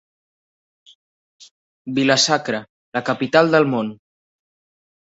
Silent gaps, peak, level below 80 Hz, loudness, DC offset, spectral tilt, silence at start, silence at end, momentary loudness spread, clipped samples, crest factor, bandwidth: 2.69-2.92 s; -2 dBFS; -64 dBFS; -18 LUFS; under 0.1%; -3.5 dB/octave; 1.85 s; 1.2 s; 13 LU; under 0.1%; 20 dB; 8.2 kHz